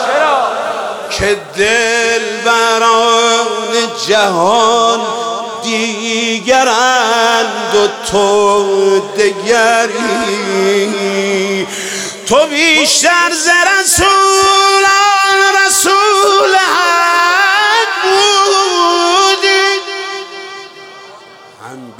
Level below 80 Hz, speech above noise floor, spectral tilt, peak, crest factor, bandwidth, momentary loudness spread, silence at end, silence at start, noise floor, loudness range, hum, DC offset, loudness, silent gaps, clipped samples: -44 dBFS; 25 dB; -1.5 dB/octave; 0 dBFS; 12 dB; 17 kHz; 9 LU; 0.05 s; 0 s; -36 dBFS; 4 LU; none; under 0.1%; -10 LUFS; none; under 0.1%